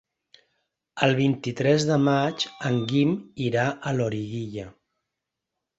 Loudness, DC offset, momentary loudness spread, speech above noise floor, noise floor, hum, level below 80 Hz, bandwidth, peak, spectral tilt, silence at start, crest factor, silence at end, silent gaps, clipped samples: -24 LUFS; under 0.1%; 12 LU; 60 dB; -84 dBFS; none; -60 dBFS; 8 kHz; -4 dBFS; -6 dB/octave; 0.95 s; 22 dB; 1.1 s; none; under 0.1%